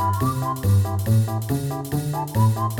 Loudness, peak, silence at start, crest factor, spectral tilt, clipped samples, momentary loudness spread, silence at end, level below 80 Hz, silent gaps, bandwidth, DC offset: -22 LUFS; -8 dBFS; 0 s; 12 dB; -7 dB/octave; under 0.1%; 5 LU; 0 s; -44 dBFS; none; 18.5 kHz; under 0.1%